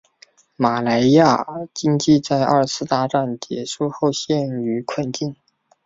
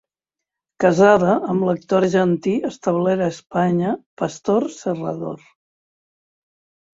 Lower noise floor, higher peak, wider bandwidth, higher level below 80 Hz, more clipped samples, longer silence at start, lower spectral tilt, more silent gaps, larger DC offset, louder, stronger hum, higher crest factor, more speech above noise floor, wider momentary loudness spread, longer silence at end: second, -53 dBFS vs -86 dBFS; about the same, -2 dBFS vs -2 dBFS; about the same, 7.8 kHz vs 7.8 kHz; about the same, -58 dBFS vs -60 dBFS; neither; second, 0.6 s vs 0.8 s; second, -5.5 dB/octave vs -7 dB/octave; second, none vs 4.06-4.17 s; neither; about the same, -19 LUFS vs -19 LUFS; neither; about the same, 18 dB vs 18 dB; second, 34 dB vs 67 dB; about the same, 11 LU vs 12 LU; second, 0.5 s vs 1.6 s